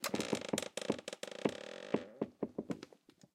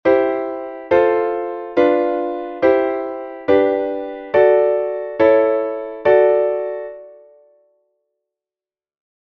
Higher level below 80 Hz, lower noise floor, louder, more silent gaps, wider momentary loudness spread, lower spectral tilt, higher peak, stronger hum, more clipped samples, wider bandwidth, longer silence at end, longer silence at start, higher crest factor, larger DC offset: second, -78 dBFS vs -56 dBFS; second, -64 dBFS vs under -90 dBFS; second, -41 LUFS vs -17 LUFS; neither; second, 9 LU vs 13 LU; second, -4 dB/octave vs -7.5 dB/octave; second, -16 dBFS vs -2 dBFS; neither; neither; first, 16 kHz vs 5.8 kHz; second, 0.5 s vs 2.1 s; about the same, 0 s vs 0.05 s; first, 24 dB vs 16 dB; neither